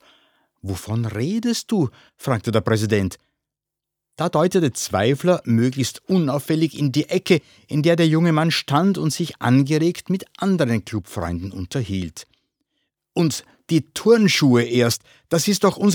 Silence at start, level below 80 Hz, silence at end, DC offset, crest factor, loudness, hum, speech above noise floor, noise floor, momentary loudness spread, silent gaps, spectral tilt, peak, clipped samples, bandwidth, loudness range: 0.65 s; -58 dBFS; 0 s; under 0.1%; 18 dB; -20 LUFS; none; 65 dB; -85 dBFS; 11 LU; none; -5.5 dB/octave; -2 dBFS; under 0.1%; over 20 kHz; 6 LU